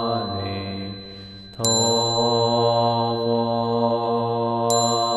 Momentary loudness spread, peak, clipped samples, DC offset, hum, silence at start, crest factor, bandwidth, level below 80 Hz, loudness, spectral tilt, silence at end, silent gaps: 14 LU; -4 dBFS; under 0.1%; under 0.1%; none; 0 s; 16 dB; 13 kHz; -56 dBFS; -21 LUFS; -4 dB/octave; 0 s; none